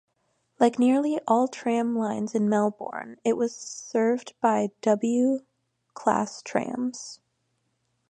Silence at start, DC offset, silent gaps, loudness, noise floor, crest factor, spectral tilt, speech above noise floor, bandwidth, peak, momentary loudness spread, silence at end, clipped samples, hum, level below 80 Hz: 0.6 s; under 0.1%; none; -26 LUFS; -74 dBFS; 20 dB; -5.5 dB/octave; 49 dB; 9.8 kHz; -6 dBFS; 9 LU; 0.95 s; under 0.1%; none; -76 dBFS